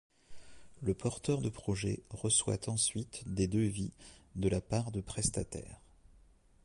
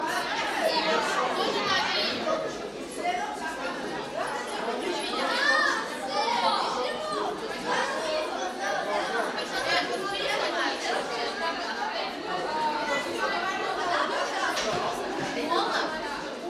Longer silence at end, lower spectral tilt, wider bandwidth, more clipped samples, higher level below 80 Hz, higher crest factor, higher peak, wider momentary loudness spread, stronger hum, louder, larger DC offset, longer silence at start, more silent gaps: first, 0.9 s vs 0 s; first, -4.5 dB/octave vs -2 dB/octave; second, 11.5 kHz vs 15 kHz; neither; first, -52 dBFS vs -62 dBFS; about the same, 20 dB vs 16 dB; second, -18 dBFS vs -12 dBFS; first, 11 LU vs 7 LU; neither; second, -35 LUFS vs -28 LUFS; neither; first, 0.3 s vs 0 s; neither